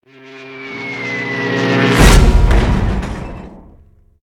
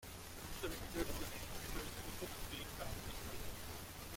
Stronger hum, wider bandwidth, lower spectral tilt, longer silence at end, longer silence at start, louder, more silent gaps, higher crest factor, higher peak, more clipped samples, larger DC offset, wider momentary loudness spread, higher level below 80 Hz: neither; about the same, 16.5 kHz vs 16.5 kHz; first, -5.5 dB/octave vs -3.5 dB/octave; first, 0.7 s vs 0 s; first, 0.25 s vs 0 s; first, -14 LUFS vs -47 LUFS; neither; second, 14 dB vs 20 dB; first, 0 dBFS vs -26 dBFS; neither; neither; first, 21 LU vs 5 LU; first, -16 dBFS vs -52 dBFS